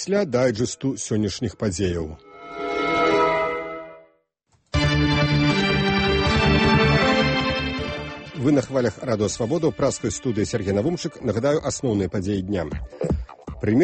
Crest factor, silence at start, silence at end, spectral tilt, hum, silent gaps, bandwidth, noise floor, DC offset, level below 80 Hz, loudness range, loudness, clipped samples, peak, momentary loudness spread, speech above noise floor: 16 dB; 0 s; 0 s; -5.5 dB/octave; none; none; 8.8 kHz; -66 dBFS; under 0.1%; -36 dBFS; 5 LU; -22 LUFS; under 0.1%; -6 dBFS; 12 LU; 43 dB